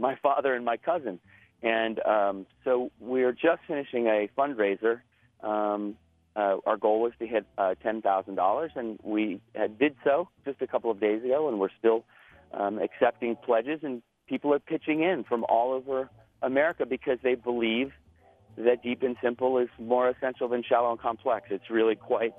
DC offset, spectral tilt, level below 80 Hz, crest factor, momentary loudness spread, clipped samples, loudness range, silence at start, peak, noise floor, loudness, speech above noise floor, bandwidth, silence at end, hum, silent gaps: under 0.1%; -8 dB/octave; -70 dBFS; 20 dB; 7 LU; under 0.1%; 1 LU; 0 s; -8 dBFS; -59 dBFS; -28 LUFS; 31 dB; 3.9 kHz; 0.05 s; none; none